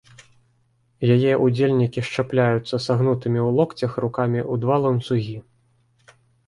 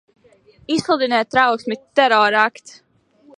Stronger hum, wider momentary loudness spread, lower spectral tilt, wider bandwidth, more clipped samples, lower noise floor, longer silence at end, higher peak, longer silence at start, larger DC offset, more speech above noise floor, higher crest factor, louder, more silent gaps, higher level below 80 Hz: neither; about the same, 7 LU vs 9 LU; first, -8 dB/octave vs -3.5 dB/octave; about the same, 11 kHz vs 11 kHz; neither; first, -64 dBFS vs -52 dBFS; first, 1.05 s vs 0.9 s; second, -6 dBFS vs 0 dBFS; first, 1 s vs 0.7 s; neither; first, 44 dB vs 35 dB; about the same, 16 dB vs 18 dB; second, -21 LUFS vs -17 LUFS; neither; about the same, -58 dBFS vs -62 dBFS